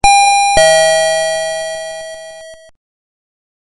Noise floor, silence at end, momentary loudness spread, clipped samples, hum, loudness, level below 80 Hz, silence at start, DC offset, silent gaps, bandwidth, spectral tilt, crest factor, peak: -34 dBFS; 1.15 s; 20 LU; under 0.1%; none; -11 LUFS; -36 dBFS; 0.05 s; under 0.1%; none; 11.5 kHz; -0.5 dB/octave; 14 dB; 0 dBFS